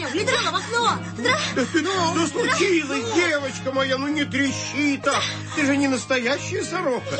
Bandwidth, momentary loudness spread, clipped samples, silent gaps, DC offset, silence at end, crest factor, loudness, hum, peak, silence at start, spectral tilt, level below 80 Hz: 8.8 kHz; 4 LU; under 0.1%; none; under 0.1%; 0 s; 14 dB; -22 LUFS; none; -8 dBFS; 0 s; -3.5 dB/octave; -58 dBFS